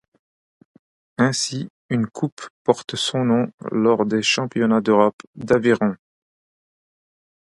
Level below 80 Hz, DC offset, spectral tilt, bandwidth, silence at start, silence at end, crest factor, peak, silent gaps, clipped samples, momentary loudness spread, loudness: -62 dBFS; under 0.1%; -5 dB/octave; 11.5 kHz; 1.2 s; 1.6 s; 20 dB; -2 dBFS; 1.70-1.89 s, 2.32-2.37 s, 2.50-2.65 s, 3.54-3.58 s, 5.13-5.18 s, 5.27-5.33 s; under 0.1%; 10 LU; -20 LUFS